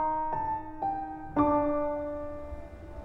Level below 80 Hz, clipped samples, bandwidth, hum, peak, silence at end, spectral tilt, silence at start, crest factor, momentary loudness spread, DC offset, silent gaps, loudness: -48 dBFS; under 0.1%; 5.4 kHz; none; -12 dBFS; 0 s; -9.5 dB/octave; 0 s; 18 dB; 16 LU; under 0.1%; none; -31 LUFS